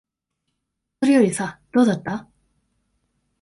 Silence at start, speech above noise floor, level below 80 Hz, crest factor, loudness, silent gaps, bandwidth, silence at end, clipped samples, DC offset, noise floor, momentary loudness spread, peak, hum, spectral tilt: 1 s; 60 dB; -62 dBFS; 18 dB; -20 LUFS; none; 11.5 kHz; 1.2 s; under 0.1%; under 0.1%; -79 dBFS; 13 LU; -6 dBFS; none; -5.5 dB/octave